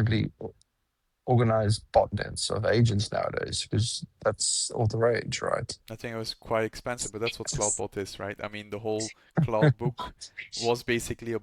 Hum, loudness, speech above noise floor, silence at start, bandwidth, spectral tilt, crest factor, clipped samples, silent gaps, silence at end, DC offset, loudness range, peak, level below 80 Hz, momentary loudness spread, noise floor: none; -28 LUFS; 49 dB; 0 s; 14 kHz; -4.5 dB/octave; 22 dB; under 0.1%; none; 0 s; under 0.1%; 4 LU; -8 dBFS; -52 dBFS; 13 LU; -78 dBFS